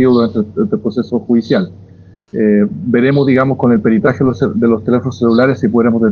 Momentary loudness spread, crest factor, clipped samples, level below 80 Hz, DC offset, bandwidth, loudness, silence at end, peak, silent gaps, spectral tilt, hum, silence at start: 5 LU; 12 dB; under 0.1%; -50 dBFS; under 0.1%; 6.8 kHz; -13 LUFS; 0 s; 0 dBFS; none; -9 dB/octave; none; 0 s